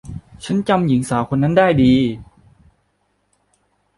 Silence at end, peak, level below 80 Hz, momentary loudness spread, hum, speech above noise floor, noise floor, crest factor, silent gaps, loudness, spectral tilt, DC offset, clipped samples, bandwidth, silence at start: 1.75 s; -2 dBFS; -44 dBFS; 18 LU; 50 Hz at -50 dBFS; 50 dB; -66 dBFS; 16 dB; none; -16 LUFS; -7 dB/octave; under 0.1%; under 0.1%; 11.5 kHz; 0.05 s